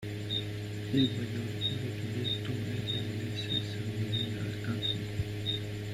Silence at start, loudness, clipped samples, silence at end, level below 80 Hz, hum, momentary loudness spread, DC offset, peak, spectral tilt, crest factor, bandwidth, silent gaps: 0 s; -34 LUFS; under 0.1%; 0 s; -56 dBFS; none; 5 LU; under 0.1%; -16 dBFS; -6 dB/octave; 18 dB; 15 kHz; none